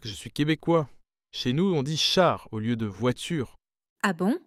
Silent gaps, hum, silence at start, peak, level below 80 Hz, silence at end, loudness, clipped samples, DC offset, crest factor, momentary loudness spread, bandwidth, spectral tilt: 3.90-3.96 s; none; 0 s; -8 dBFS; -56 dBFS; 0.1 s; -26 LUFS; under 0.1%; under 0.1%; 18 dB; 11 LU; 16 kHz; -5 dB/octave